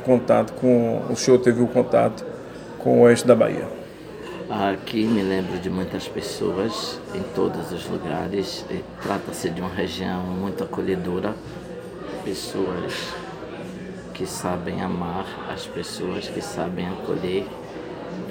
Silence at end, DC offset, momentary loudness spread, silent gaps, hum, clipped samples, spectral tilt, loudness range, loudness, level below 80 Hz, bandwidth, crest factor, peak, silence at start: 0 s; under 0.1%; 17 LU; none; none; under 0.1%; -5.5 dB/octave; 10 LU; -23 LUFS; -52 dBFS; 18.5 kHz; 22 dB; -2 dBFS; 0 s